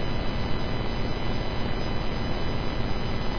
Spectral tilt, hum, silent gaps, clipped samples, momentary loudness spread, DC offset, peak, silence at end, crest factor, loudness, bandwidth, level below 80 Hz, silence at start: -6.5 dB/octave; none; none; under 0.1%; 0 LU; 2%; -12 dBFS; 0 s; 12 dB; -30 LUFS; 5.4 kHz; -30 dBFS; 0 s